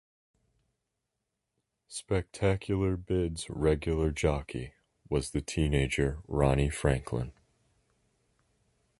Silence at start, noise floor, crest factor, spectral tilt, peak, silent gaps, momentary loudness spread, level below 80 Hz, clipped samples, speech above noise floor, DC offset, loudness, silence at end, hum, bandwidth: 1.9 s; -85 dBFS; 22 dB; -6 dB/octave; -10 dBFS; none; 11 LU; -42 dBFS; under 0.1%; 55 dB; under 0.1%; -31 LUFS; 1.7 s; none; 11.5 kHz